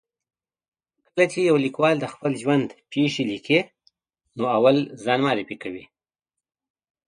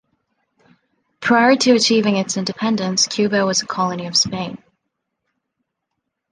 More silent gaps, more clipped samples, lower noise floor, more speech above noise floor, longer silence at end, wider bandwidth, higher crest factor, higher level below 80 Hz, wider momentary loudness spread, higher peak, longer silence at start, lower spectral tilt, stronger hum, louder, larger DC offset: neither; neither; first, -88 dBFS vs -77 dBFS; first, 66 dB vs 60 dB; second, 1.25 s vs 1.75 s; about the same, 10.5 kHz vs 11 kHz; about the same, 20 dB vs 18 dB; second, -68 dBFS vs -60 dBFS; first, 14 LU vs 9 LU; about the same, -4 dBFS vs -2 dBFS; about the same, 1.15 s vs 1.2 s; first, -6 dB/octave vs -3.5 dB/octave; neither; second, -22 LUFS vs -17 LUFS; neither